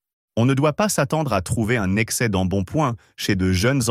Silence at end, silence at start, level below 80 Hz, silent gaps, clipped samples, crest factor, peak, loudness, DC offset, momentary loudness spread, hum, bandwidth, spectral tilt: 0 s; 0.35 s; -44 dBFS; none; under 0.1%; 14 dB; -6 dBFS; -21 LUFS; under 0.1%; 5 LU; none; 16 kHz; -5 dB/octave